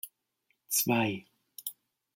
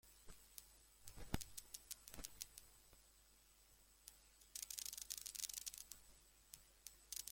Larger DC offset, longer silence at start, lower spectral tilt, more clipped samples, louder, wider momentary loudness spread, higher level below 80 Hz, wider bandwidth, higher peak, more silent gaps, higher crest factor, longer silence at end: neither; about the same, 0.05 s vs 0.05 s; first, -3.5 dB/octave vs -1.5 dB/octave; neither; first, -31 LUFS vs -53 LUFS; about the same, 18 LU vs 20 LU; second, -76 dBFS vs -68 dBFS; about the same, 16.5 kHz vs 17 kHz; first, -14 dBFS vs -22 dBFS; neither; second, 20 dB vs 34 dB; first, 0.45 s vs 0 s